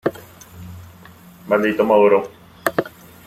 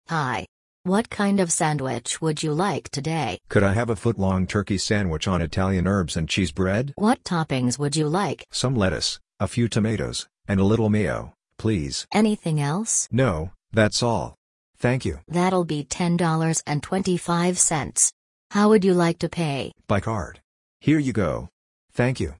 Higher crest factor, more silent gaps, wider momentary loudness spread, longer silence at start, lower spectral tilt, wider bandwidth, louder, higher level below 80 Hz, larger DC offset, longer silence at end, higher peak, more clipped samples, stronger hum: about the same, 20 dB vs 18 dB; second, none vs 0.48-0.84 s, 14.37-14.74 s, 18.13-18.50 s, 20.44-20.80 s, 21.52-21.88 s; first, 25 LU vs 8 LU; about the same, 0.05 s vs 0.1 s; about the same, -6 dB/octave vs -5 dB/octave; first, 16 kHz vs 11 kHz; first, -18 LUFS vs -23 LUFS; second, -58 dBFS vs -46 dBFS; neither; first, 0.4 s vs 0.05 s; first, 0 dBFS vs -4 dBFS; neither; neither